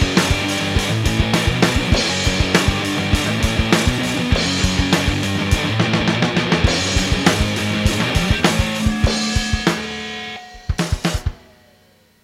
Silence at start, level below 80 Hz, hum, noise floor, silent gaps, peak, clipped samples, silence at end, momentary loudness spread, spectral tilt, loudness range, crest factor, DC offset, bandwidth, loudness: 0 s; -26 dBFS; none; -53 dBFS; none; 0 dBFS; under 0.1%; 0.9 s; 6 LU; -4.5 dB/octave; 3 LU; 18 dB; under 0.1%; 16.5 kHz; -18 LUFS